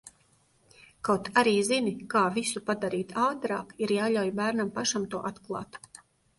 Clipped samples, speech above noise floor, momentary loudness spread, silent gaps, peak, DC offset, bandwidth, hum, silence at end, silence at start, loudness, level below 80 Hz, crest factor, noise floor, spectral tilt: under 0.1%; 38 dB; 12 LU; none; -10 dBFS; under 0.1%; 12 kHz; none; 0.6 s; 0.05 s; -28 LUFS; -66 dBFS; 20 dB; -66 dBFS; -4 dB/octave